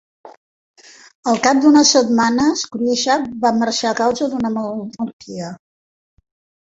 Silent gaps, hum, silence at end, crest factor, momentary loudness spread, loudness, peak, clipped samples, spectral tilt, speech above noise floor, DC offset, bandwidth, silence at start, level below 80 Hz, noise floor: 0.37-0.74 s, 1.15-1.23 s, 5.13-5.20 s; none; 1.1 s; 16 dB; 16 LU; -16 LUFS; -2 dBFS; under 0.1%; -3 dB/octave; over 74 dB; under 0.1%; 8 kHz; 0.25 s; -56 dBFS; under -90 dBFS